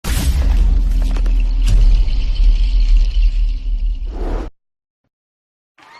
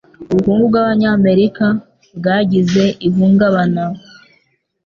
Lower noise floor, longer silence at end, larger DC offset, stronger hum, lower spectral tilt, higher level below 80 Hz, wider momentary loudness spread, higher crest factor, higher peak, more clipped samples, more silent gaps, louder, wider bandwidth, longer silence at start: first, under -90 dBFS vs -61 dBFS; first, 1.5 s vs 0.85 s; neither; neither; second, -5.5 dB/octave vs -7.5 dB/octave; first, -14 dBFS vs -48 dBFS; about the same, 9 LU vs 9 LU; about the same, 10 dB vs 12 dB; about the same, -4 dBFS vs -2 dBFS; neither; neither; second, -19 LUFS vs -14 LUFS; first, 13.5 kHz vs 7 kHz; second, 0.05 s vs 0.2 s